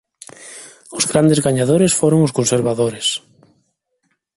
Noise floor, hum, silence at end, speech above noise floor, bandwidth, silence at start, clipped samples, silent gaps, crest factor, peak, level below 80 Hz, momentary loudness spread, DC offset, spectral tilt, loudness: -68 dBFS; none; 1.2 s; 53 dB; 11.5 kHz; 0.4 s; under 0.1%; none; 18 dB; 0 dBFS; -52 dBFS; 21 LU; under 0.1%; -4.5 dB/octave; -16 LUFS